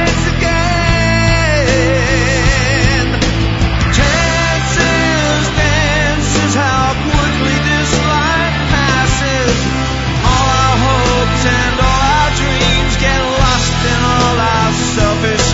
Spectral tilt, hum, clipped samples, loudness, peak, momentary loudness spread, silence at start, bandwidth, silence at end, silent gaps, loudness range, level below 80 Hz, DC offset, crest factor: -4.5 dB/octave; none; under 0.1%; -12 LUFS; 0 dBFS; 2 LU; 0 s; 8 kHz; 0 s; none; 1 LU; -20 dBFS; under 0.1%; 12 dB